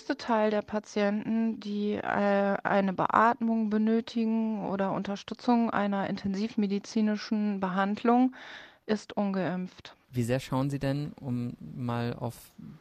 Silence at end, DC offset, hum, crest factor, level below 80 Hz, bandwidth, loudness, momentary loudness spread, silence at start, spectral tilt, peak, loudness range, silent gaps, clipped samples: 0.05 s; under 0.1%; none; 22 dB; -64 dBFS; 14 kHz; -29 LUFS; 10 LU; 0 s; -7 dB/octave; -6 dBFS; 5 LU; none; under 0.1%